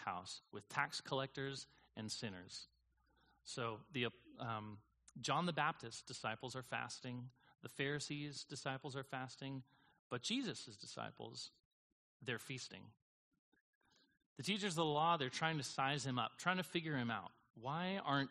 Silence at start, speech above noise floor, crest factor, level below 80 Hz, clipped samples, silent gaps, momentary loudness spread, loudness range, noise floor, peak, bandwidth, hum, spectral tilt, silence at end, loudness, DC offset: 0 s; 35 dB; 24 dB; -80 dBFS; under 0.1%; 9.99-10.10 s, 11.65-12.20 s, 13.02-13.31 s, 13.39-13.52 s, 13.61-13.81 s, 14.26-14.36 s, 17.50-17.54 s; 14 LU; 8 LU; -78 dBFS; -20 dBFS; 11.5 kHz; none; -4 dB/octave; 0 s; -44 LUFS; under 0.1%